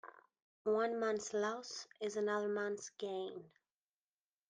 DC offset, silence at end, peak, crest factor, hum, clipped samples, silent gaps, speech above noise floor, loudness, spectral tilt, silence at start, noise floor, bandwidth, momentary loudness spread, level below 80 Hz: under 0.1%; 1 s; -24 dBFS; 16 dB; none; under 0.1%; 0.42-0.65 s; over 51 dB; -40 LUFS; -3.5 dB/octave; 0.05 s; under -90 dBFS; 9.6 kHz; 11 LU; -88 dBFS